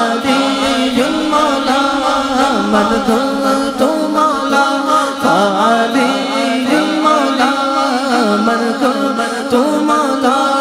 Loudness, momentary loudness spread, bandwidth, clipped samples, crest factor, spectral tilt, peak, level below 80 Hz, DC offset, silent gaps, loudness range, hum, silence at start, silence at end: -13 LUFS; 2 LU; 16 kHz; under 0.1%; 14 dB; -4 dB/octave; 0 dBFS; -46 dBFS; under 0.1%; none; 1 LU; none; 0 s; 0 s